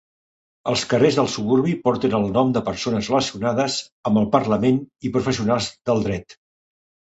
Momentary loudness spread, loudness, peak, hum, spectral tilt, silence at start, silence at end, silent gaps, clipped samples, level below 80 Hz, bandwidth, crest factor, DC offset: 6 LU; -21 LUFS; -2 dBFS; none; -5.5 dB/octave; 0.65 s; 0.8 s; 3.92-4.03 s; under 0.1%; -50 dBFS; 8.2 kHz; 18 dB; under 0.1%